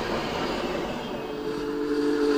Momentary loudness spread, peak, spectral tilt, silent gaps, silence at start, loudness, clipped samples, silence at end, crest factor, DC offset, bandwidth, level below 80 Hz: 7 LU; -14 dBFS; -5 dB/octave; none; 0 s; -29 LUFS; under 0.1%; 0 s; 14 dB; under 0.1%; 16 kHz; -48 dBFS